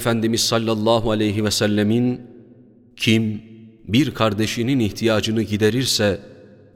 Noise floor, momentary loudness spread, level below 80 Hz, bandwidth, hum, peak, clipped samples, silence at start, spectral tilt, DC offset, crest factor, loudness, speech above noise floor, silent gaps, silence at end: -48 dBFS; 4 LU; -48 dBFS; 16.5 kHz; none; -2 dBFS; under 0.1%; 0 s; -5 dB/octave; under 0.1%; 18 dB; -19 LUFS; 29 dB; none; 0.4 s